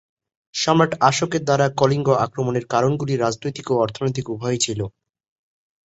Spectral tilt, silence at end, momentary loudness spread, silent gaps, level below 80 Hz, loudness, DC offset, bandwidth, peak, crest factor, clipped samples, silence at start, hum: -5 dB/octave; 0.95 s; 8 LU; none; -56 dBFS; -20 LUFS; under 0.1%; 8.2 kHz; -2 dBFS; 18 dB; under 0.1%; 0.55 s; none